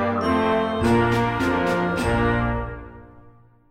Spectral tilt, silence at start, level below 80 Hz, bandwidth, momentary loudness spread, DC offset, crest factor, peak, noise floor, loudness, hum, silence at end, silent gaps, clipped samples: -6.5 dB/octave; 0 s; -36 dBFS; 16 kHz; 8 LU; under 0.1%; 14 dB; -8 dBFS; -50 dBFS; -21 LUFS; none; 0.4 s; none; under 0.1%